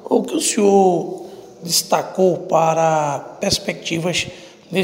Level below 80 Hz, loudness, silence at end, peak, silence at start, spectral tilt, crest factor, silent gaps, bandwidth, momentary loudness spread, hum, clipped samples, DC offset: -52 dBFS; -18 LUFS; 0 s; 0 dBFS; 0 s; -4 dB/octave; 18 dB; none; 16 kHz; 13 LU; none; under 0.1%; under 0.1%